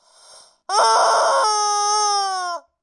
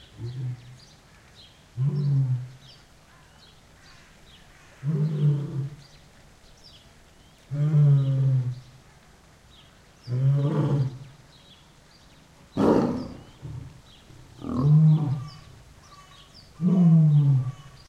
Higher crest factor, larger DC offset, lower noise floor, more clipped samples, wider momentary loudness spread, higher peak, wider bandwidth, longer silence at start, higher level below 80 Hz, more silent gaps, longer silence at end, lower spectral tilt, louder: about the same, 14 dB vs 18 dB; neither; second, -48 dBFS vs -54 dBFS; neither; second, 8 LU vs 22 LU; about the same, -6 dBFS vs -8 dBFS; first, 11.5 kHz vs 7.6 kHz; first, 0.7 s vs 0.2 s; second, -80 dBFS vs -56 dBFS; neither; about the same, 0.25 s vs 0.2 s; second, 3 dB/octave vs -9.5 dB/octave; first, -18 LUFS vs -24 LUFS